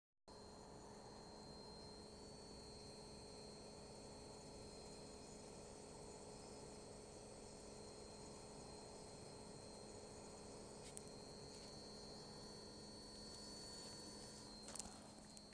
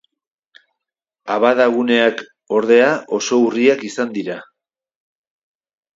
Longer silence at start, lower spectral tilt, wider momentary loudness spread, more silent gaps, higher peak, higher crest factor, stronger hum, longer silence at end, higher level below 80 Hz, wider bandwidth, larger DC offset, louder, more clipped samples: second, 0.25 s vs 1.25 s; about the same, -3.5 dB/octave vs -4 dB/octave; second, 4 LU vs 14 LU; neither; second, -26 dBFS vs 0 dBFS; first, 30 dB vs 18 dB; neither; second, 0 s vs 1.5 s; about the same, -70 dBFS vs -70 dBFS; first, 11 kHz vs 7.8 kHz; neither; second, -57 LUFS vs -16 LUFS; neither